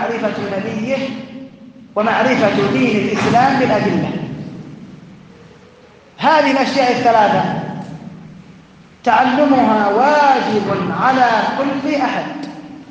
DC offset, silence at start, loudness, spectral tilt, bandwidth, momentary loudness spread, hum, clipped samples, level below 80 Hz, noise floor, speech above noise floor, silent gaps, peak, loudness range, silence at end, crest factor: under 0.1%; 0 s; -15 LUFS; -6 dB/octave; 9 kHz; 18 LU; none; under 0.1%; -56 dBFS; -44 dBFS; 30 dB; none; 0 dBFS; 4 LU; 0 s; 16 dB